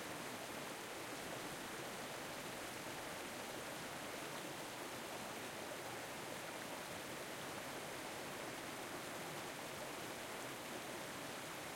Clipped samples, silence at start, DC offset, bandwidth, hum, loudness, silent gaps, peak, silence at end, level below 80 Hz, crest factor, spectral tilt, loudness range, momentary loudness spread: under 0.1%; 0 s; under 0.1%; 16.5 kHz; none; -47 LUFS; none; -34 dBFS; 0 s; -76 dBFS; 14 dB; -2.5 dB/octave; 0 LU; 1 LU